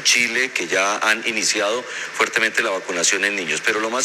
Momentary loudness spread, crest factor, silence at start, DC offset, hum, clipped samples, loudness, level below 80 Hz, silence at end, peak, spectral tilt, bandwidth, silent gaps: 5 LU; 16 dB; 0 s; under 0.1%; none; under 0.1%; -19 LUFS; -72 dBFS; 0 s; -4 dBFS; 0 dB/octave; 16 kHz; none